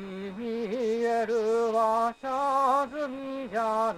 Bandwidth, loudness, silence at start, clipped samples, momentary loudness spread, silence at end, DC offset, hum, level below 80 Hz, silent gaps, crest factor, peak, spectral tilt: 15 kHz; -28 LUFS; 0 s; under 0.1%; 9 LU; 0 s; under 0.1%; none; -66 dBFS; none; 12 dB; -14 dBFS; -5 dB/octave